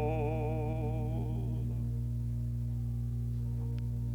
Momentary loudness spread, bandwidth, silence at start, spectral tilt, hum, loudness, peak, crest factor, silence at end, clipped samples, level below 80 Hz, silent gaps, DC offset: 3 LU; 3.7 kHz; 0 s; -9.5 dB/octave; 60 Hz at -45 dBFS; -35 LUFS; -20 dBFS; 14 dB; 0 s; under 0.1%; -40 dBFS; none; under 0.1%